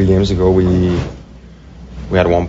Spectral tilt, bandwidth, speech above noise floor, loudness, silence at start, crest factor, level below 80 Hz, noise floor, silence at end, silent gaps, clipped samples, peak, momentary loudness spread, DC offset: -7 dB/octave; 7.8 kHz; 25 dB; -14 LUFS; 0 s; 14 dB; -28 dBFS; -37 dBFS; 0 s; none; under 0.1%; 0 dBFS; 21 LU; under 0.1%